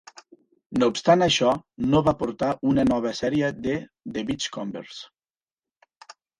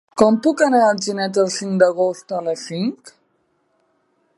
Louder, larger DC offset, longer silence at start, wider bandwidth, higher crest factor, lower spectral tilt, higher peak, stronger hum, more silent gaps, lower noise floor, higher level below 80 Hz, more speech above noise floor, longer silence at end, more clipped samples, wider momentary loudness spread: second, -24 LUFS vs -18 LUFS; neither; about the same, 0.15 s vs 0.15 s; about the same, 11 kHz vs 11.5 kHz; about the same, 20 dB vs 18 dB; about the same, -5 dB/octave vs -5 dB/octave; second, -4 dBFS vs 0 dBFS; neither; first, 0.66-0.70 s vs none; first, under -90 dBFS vs -65 dBFS; first, -52 dBFS vs -64 dBFS; first, over 67 dB vs 48 dB; about the same, 1.35 s vs 1.3 s; neither; first, 14 LU vs 10 LU